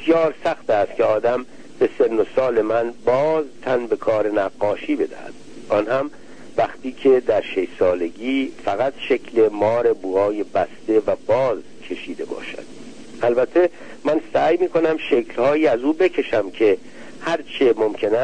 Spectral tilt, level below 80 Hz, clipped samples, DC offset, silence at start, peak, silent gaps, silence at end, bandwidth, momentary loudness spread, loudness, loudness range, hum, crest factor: -6 dB/octave; -56 dBFS; under 0.1%; 1%; 0 s; -6 dBFS; none; 0 s; 9.6 kHz; 12 LU; -20 LUFS; 3 LU; none; 14 dB